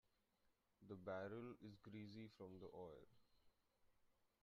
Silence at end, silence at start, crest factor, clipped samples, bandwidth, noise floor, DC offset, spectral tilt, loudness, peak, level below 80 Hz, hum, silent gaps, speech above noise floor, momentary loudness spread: 0.15 s; 0.45 s; 20 dB; under 0.1%; 7 kHz; -85 dBFS; under 0.1%; -6 dB/octave; -57 LUFS; -40 dBFS; -86 dBFS; none; none; 28 dB; 10 LU